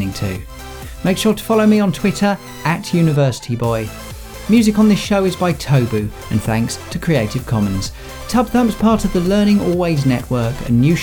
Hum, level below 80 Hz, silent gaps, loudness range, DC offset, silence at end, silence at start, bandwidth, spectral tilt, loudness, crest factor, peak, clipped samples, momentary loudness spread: none; -34 dBFS; none; 2 LU; under 0.1%; 0 s; 0 s; over 20 kHz; -6.5 dB/octave; -16 LUFS; 14 dB; -2 dBFS; under 0.1%; 11 LU